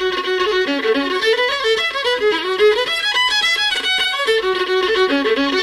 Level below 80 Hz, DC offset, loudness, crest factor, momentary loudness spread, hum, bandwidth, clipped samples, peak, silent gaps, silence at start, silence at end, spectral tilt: -52 dBFS; under 0.1%; -16 LUFS; 14 dB; 3 LU; none; 15 kHz; under 0.1%; -4 dBFS; none; 0 s; 0 s; -1.5 dB/octave